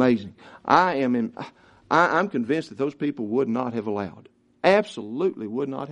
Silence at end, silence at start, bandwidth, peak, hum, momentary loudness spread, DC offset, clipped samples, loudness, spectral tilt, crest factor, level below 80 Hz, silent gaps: 0 s; 0 s; 10 kHz; -2 dBFS; none; 13 LU; under 0.1%; under 0.1%; -24 LUFS; -6.5 dB/octave; 22 dB; -66 dBFS; none